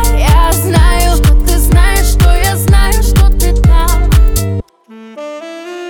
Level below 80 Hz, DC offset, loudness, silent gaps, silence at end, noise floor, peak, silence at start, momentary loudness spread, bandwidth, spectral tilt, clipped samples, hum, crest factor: -10 dBFS; under 0.1%; -10 LUFS; none; 0 s; -35 dBFS; 0 dBFS; 0 s; 15 LU; 19.5 kHz; -5 dB/octave; under 0.1%; none; 8 dB